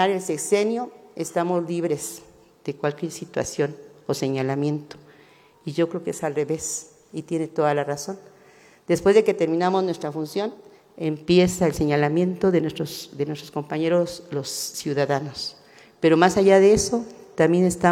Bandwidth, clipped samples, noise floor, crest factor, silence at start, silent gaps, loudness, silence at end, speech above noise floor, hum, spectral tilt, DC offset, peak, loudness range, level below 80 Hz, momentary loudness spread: 16 kHz; under 0.1%; -53 dBFS; 22 dB; 0 s; none; -23 LUFS; 0 s; 31 dB; none; -5 dB/octave; under 0.1%; -2 dBFS; 7 LU; -54 dBFS; 14 LU